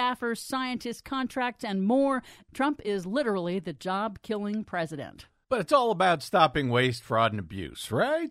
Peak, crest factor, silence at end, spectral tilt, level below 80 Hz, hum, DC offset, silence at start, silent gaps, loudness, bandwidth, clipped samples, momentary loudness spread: -8 dBFS; 20 dB; 0 s; -5.5 dB/octave; -58 dBFS; none; under 0.1%; 0 s; none; -28 LUFS; 15.5 kHz; under 0.1%; 10 LU